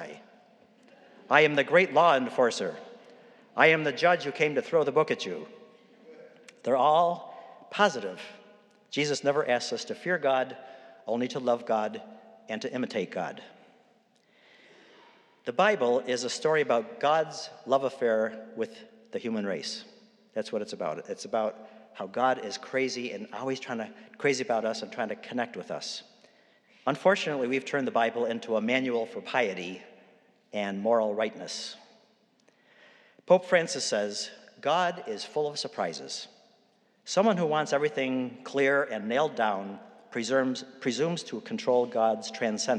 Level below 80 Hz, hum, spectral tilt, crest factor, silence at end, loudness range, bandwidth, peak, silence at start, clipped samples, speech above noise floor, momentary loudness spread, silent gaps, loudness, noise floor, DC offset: under -90 dBFS; none; -4 dB/octave; 26 dB; 0 s; 7 LU; 11 kHz; -4 dBFS; 0 s; under 0.1%; 38 dB; 15 LU; none; -28 LUFS; -66 dBFS; under 0.1%